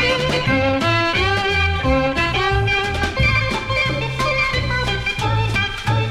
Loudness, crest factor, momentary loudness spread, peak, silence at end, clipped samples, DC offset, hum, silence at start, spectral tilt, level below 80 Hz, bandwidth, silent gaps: -18 LUFS; 14 dB; 3 LU; -4 dBFS; 0 s; under 0.1%; under 0.1%; none; 0 s; -5 dB/octave; -30 dBFS; 13.5 kHz; none